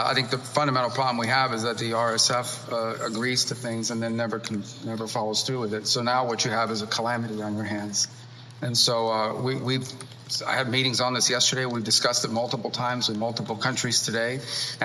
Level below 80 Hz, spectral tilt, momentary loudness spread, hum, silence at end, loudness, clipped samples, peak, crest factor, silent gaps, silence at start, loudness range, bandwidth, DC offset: -76 dBFS; -3 dB/octave; 9 LU; none; 0 s; -25 LUFS; under 0.1%; -6 dBFS; 20 dB; none; 0 s; 3 LU; 15 kHz; under 0.1%